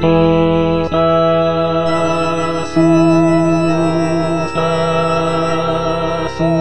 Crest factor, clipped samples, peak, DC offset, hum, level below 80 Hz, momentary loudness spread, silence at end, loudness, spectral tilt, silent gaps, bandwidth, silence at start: 14 dB; under 0.1%; 0 dBFS; 4%; none; -38 dBFS; 6 LU; 0 s; -14 LUFS; -7 dB/octave; none; 9.4 kHz; 0 s